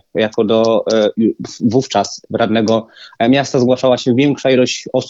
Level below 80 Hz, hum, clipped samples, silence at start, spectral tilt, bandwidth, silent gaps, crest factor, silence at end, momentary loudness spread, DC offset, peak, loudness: -56 dBFS; none; under 0.1%; 0.15 s; -5.5 dB/octave; 8 kHz; none; 14 dB; 0 s; 5 LU; under 0.1%; 0 dBFS; -14 LUFS